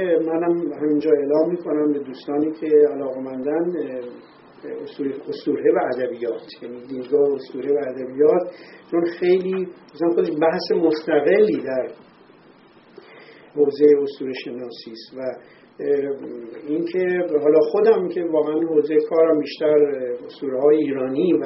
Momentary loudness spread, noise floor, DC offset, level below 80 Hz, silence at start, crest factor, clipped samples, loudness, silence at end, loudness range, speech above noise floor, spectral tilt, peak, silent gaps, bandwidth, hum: 16 LU; -50 dBFS; under 0.1%; -70 dBFS; 0 s; 18 dB; under 0.1%; -20 LUFS; 0 s; 6 LU; 30 dB; -5.5 dB/octave; -2 dBFS; none; 5.8 kHz; none